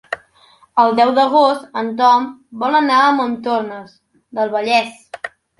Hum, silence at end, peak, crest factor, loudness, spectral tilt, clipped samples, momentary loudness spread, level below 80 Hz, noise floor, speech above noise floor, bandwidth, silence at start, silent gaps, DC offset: none; 0.3 s; 0 dBFS; 16 dB; -15 LUFS; -4 dB/octave; under 0.1%; 16 LU; -66 dBFS; -51 dBFS; 36 dB; 11.5 kHz; 0.1 s; none; under 0.1%